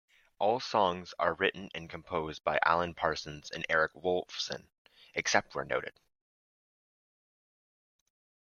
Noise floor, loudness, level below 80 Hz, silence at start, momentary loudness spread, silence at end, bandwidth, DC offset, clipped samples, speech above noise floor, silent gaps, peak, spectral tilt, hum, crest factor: under -90 dBFS; -32 LUFS; -66 dBFS; 0.4 s; 12 LU; 2.6 s; 7.4 kHz; under 0.1%; under 0.1%; over 58 dB; 4.78-4.85 s; -8 dBFS; -3 dB/octave; none; 26 dB